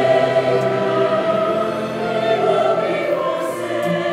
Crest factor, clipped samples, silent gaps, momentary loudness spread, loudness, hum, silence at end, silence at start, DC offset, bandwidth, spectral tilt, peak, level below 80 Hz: 14 dB; under 0.1%; none; 6 LU; -18 LUFS; none; 0 s; 0 s; under 0.1%; 14.5 kHz; -6 dB/octave; -4 dBFS; -62 dBFS